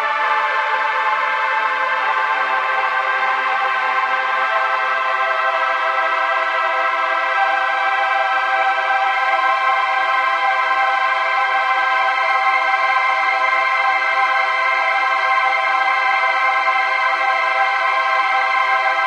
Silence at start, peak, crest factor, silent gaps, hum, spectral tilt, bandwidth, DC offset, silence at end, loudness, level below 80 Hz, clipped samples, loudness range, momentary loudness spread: 0 s; -4 dBFS; 14 dB; none; none; 1.5 dB/octave; 10 kHz; under 0.1%; 0 s; -16 LUFS; under -90 dBFS; under 0.1%; 2 LU; 2 LU